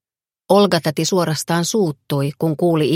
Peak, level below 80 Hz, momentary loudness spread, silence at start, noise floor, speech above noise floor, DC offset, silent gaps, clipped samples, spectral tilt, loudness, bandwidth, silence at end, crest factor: 0 dBFS; -62 dBFS; 6 LU; 0.5 s; -54 dBFS; 37 dB; under 0.1%; none; under 0.1%; -5 dB/octave; -18 LUFS; 16.5 kHz; 0 s; 18 dB